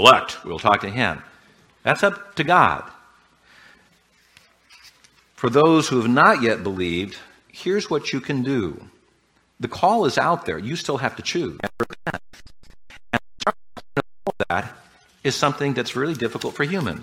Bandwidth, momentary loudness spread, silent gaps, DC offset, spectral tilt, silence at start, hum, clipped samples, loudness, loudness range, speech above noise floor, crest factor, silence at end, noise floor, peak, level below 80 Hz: 16.5 kHz; 15 LU; none; under 0.1%; -4.5 dB/octave; 0 s; none; under 0.1%; -21 LUFS; 8 LU; 42 dB; 22 dB; 0 s; -62 dBFS; 0 dBFS; -54 dBFS